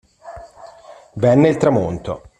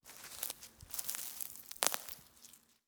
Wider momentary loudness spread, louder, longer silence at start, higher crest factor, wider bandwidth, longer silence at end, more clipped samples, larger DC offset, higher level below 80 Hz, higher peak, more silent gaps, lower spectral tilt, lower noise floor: first, 24 LU vs 20 LU; first, -16 LUFS vs -40 LUFS; first, 0.25 s vs 0.05 s; second, 18 dB vs 40 dB; second, 10 kHz vs over 20 kHz; about the same, 0.2 s vs 0.3 s; neither; neither; first, -48 dBFS vs -72 dBFS; about the same, -2 dBFS vs -4 dBFS; neither; first, -8 dB/octave vs 0.5 dB/octave; second, -42 dBFS vs -62 dBFS